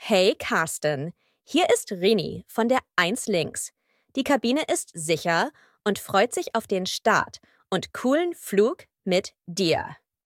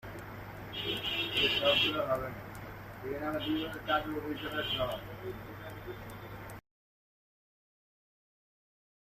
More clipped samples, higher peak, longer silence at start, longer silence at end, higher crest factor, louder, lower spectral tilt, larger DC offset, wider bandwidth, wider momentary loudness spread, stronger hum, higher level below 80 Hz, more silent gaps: neither; first, -6 dBFS vs -16 dBFS; about the same, 0 s vs 0.05 s; second, 0.3 s vs 2.55 s; about the same, 20 dB vs 22 dB; first, -25 LUFS vs -32 LUFS; about the same, -3.5 dB/octave vs -4.5 dB/octave; neither; first, 17 kHz vs 15 kHz; second, 9 LU vs 18 LU; neither; second, -64 dBFS vs -56 dBFS; neither